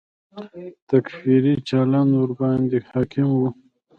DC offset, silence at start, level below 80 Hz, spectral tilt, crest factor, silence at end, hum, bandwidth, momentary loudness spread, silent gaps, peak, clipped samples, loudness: under 0.1%; 0.35 s; -56 dBFS; -9.5 dB/octave; 16 dB; 0.45 s; none; 6.8 kHz; 19 LU; 0.82-0.87 s; -4 dBFS; under 0.1%; -20 LUFS